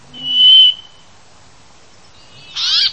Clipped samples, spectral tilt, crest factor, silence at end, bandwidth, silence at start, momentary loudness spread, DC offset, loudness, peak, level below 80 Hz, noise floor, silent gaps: under 0.1%; 1 dB/octave; 16 dB; 0 s; 8.6 kHz; 0.15 s; 22 LU; 0.6%; -8 LUFS; 0 dBFS; -58 dBFS; -46 dBFS; none